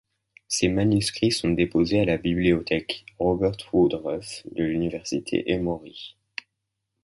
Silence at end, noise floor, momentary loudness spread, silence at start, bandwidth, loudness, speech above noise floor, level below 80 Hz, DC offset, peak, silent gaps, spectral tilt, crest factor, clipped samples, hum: 0.9 s; -81 dBFS; 12 LU; 0.5 s; 11.5 kHz; -24 LUFS; 57 dB; -46 dBFS; under 0.1%; -6 dBFS; none; -5 dB/octave; 18 dB; under 0.1%; none